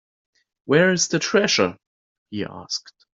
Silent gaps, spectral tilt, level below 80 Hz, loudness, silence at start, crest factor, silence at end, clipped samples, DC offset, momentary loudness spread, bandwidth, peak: 1.87-2.26 s; -3.5 dB/octave; -64 dBFS; -21 LUFS; 0.65 s; 20 dB; 0.35 s; under 0.1%; under 0.1%; 14 LU; 7.8 kHz; -4 dBFS